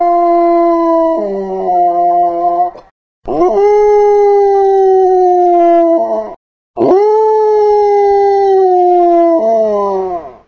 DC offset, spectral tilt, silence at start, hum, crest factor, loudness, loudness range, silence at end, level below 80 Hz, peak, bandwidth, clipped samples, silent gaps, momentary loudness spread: under 0.1%; -7 dB/octave; 0 s; none; 10 dB; -10 LUFS; 3 LU; 0.15 s; -46 dBFS; 0 dBFS; 6.6 kHz; under 0.1%; 2.91-3.22 s, 6.36-6.74 s; 9 LU